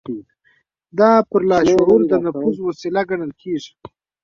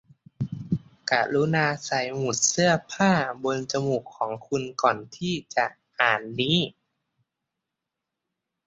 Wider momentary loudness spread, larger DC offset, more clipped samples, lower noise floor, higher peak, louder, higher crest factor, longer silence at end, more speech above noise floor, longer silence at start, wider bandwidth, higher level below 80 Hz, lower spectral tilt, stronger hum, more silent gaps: first, 15 LU vs 9 LU; neither; neither; second, -61 dBFS vs -85 dBFS; about the same, -2 dBFS vs -4 dBFS; first, -17 LUFS vs -25 LUFS; second, 16 dB vs 24 dB; second, 0.55 s vs 1.95 s; second, 45 dB vs 60 dB; second, 0.1 s vs 0.4 s; about the same, 7.4 kHz vs 8 kHz; first, -52 dBFS vs -62 dBFS; first, -6.5 dB/octave vs -3.5 dB/octave; neither; neither